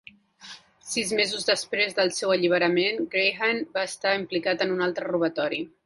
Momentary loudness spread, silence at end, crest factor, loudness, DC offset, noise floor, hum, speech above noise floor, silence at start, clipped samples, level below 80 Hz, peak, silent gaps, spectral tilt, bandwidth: 7 LU; 0.2 s; 18 dB; -25 LUFS; under 0.1%; -47 dBFS; none; 22 dB; 0.4 s; under 0.1%; -68 dBFS; -8 dBFS; none; -3 dB/octave; 11.5 kHz